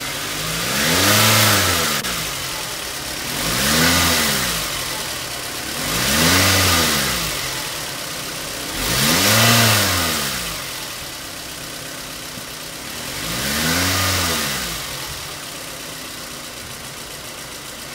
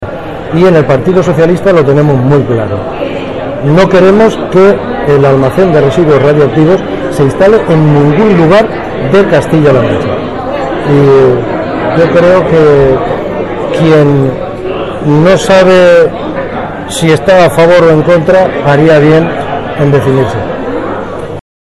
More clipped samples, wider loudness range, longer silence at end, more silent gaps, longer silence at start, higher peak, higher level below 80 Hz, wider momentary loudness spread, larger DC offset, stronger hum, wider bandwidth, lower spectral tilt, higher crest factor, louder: second, under 0.1% vs 0.2%; first, 8 LU vs 2 LU; second, 0 s vs 0.4 s; neither; about the same, 0 s vs 0 s; about the same, 0 dBFS vs 0 dBFS; second, -42 dBFS vs -30 dBFS; first, 16 LU vs 11 LU; neither; neither; first, 16 kHz vs 13 kHz; second, -2 dB/octave vs -7 dB/octave; first, 20 dB vs 6 dB; second, -17 LUFS vs -7 LUFS